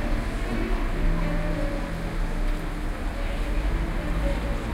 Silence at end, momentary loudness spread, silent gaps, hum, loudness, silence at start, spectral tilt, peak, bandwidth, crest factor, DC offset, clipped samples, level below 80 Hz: 0 s; 4 LU; none; none; -30 LUFS; 0 s; -6.5 dB/octave; -14 dBFS; 12.5 kHz; 12 dB; under 0.1%; under 0.1%; -26 dBFS